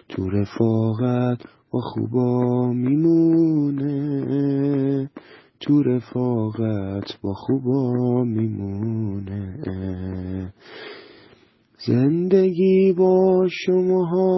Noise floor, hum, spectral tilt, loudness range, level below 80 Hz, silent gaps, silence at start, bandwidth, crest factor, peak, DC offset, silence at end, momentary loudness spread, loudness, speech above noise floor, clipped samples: -55 dBFS; none; -9.5 dB/octave; 7 LU; -48 dBFS; none; 0.1 s; 6 kHz; 16 dB; -6 dBFS; under 0.1%; 0 s; 13 LU; -21 LUFS; 35 dB; under 0.1%